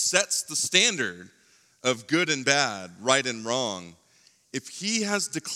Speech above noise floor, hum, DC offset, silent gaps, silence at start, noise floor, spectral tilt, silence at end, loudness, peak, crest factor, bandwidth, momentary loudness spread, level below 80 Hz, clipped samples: 35 dB; none; under 0.1%; none; 0 s; -61 dBFS; -1.5 dB/octave; 0 s; -25 LUFS; -4 dBFS; 24 dB; 17 kHz; 11 LU; -80 dBFS; under 0.1%